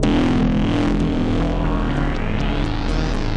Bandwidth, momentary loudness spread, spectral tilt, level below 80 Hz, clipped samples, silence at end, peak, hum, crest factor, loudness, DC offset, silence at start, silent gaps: 9.4 kHz; 5 LU; -7 dB/octave; -22 dBFS; under 0.1%; 0 s; -6 dBFS; none; 12 dB; -20 LUFS; under 0.1%; 0 s; none